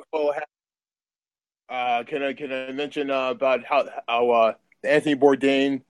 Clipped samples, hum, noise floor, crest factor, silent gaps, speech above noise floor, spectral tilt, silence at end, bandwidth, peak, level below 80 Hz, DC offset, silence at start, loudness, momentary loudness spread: under 0.1%; none; under -90 dBFS; 20 dB; none; over 68 dB; -5 dB/octave; 0.1 s; 11.5 kHz; -4 dBFS; -74 dBFS; under 0.1%; 0.15 s; -23 LUFS; 11 LU